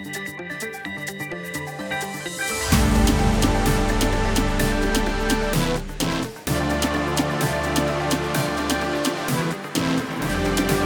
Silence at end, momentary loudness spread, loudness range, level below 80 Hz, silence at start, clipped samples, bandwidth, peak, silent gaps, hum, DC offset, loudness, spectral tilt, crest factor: 0 s; 10 LU; 2 LU; -30 dBFS; 0 s; under 0.1%; over 20 kHz; -6 dBFS; none; none; under 0.1%; -23 LUFS; -4.5 dB/octave; 18 dB